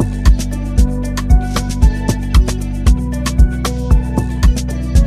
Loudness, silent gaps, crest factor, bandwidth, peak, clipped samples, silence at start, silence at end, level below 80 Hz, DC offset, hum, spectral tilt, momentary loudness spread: -16 LUFS; none; 12 dB; 14 kHz; 0 dBFS; under 0.1%; 0 s; 0 s; -14 dBFS; 0.1%; none; -6 dB/octave; 4 LU